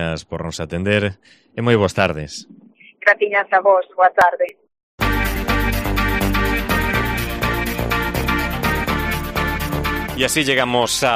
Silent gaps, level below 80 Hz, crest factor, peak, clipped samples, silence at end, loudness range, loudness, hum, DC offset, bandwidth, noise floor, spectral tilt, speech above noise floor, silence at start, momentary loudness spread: 4.83-4.98 s; -30 dBFS; 18 dB; -2 dBFS; under 0.1%; 0 s; 3 LU; -18 LUFS; none; under 0.1%; 15.5 kHz; -41 dBFS; -4.5 dB/octave; 24 dB; 0 s; 9 LU